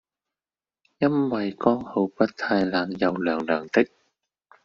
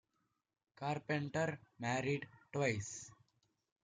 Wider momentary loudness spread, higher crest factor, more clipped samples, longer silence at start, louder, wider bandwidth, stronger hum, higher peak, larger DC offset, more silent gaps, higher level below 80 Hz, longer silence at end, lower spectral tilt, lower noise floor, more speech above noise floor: second, 4 LU vs 9 LU; about the same, 22 dB vs 20 dB; neither; first, 1 s vs 0.8 s; first, -24 LUFS vs -40 LUFS; second, 7.2 kHz vs 9.6 kHz; neither; first, -4 dBFS vs -22 dBFS; neither; neither; first, -64 dBFS vs -76 dBFS; about the same, 0.8 s vs 0.7 s; about the same, -4.5 dB/octave vs -5 dB/octave; first, under -90 dBFS vs -84 dBFS; first, over 67 dB vs 45 dB